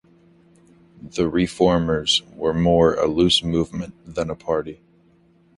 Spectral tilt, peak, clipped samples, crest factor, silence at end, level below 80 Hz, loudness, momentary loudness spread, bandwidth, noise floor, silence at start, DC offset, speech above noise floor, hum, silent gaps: -5 dB/octave; -2 dBFS; under 0.1%; 18 dB; 0.85 s; -42 dBFS; -20 LUFS; 12 LU; 11.5 kHz; -56 dBFS; 1.05 s; under 0.1%; 36 dB; none; none